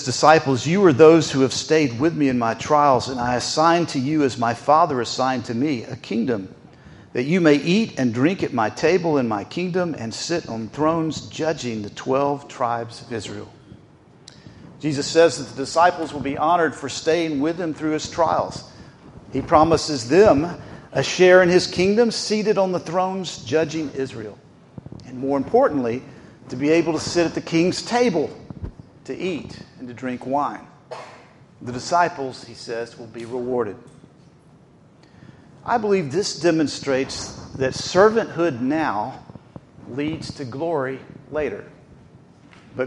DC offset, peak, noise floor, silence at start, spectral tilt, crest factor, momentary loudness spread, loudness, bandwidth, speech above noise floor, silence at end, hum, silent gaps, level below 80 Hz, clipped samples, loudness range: under 0.1%; 0 dBFS; -51 dBFS; 0 s; -5 dB/octave; 20 dB; 16 LU; -20 LUFS; 11.5 kHz; 31 dB; 0 s; none; none; -52 dBFS; under 0.1%; 10 LU